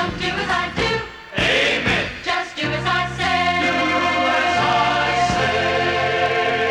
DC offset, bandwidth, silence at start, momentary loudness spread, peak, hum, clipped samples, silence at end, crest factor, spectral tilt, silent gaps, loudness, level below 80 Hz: under 0.1%; 12 kHz; 0 s; 5 LU; -4 dBFS; none; under 0.1%; 0 s; 14 dB; -4 dB/octave; none; -19 LUFS; -42 dBFS